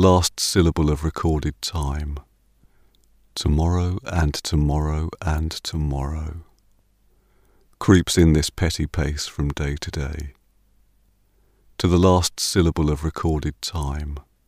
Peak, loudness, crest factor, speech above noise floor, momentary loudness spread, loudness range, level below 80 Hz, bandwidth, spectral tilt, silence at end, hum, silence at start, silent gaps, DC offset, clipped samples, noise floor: -2 dBFS; -22 LUFS; 20 dB; 40 dB; 14 LU; 5 LU; -30 dBFS; 15.5 kHz; -5.5 dB/octave; 0.25 s; none; 0 s; none; under 0.1%; under 0.1%; -60 dBFS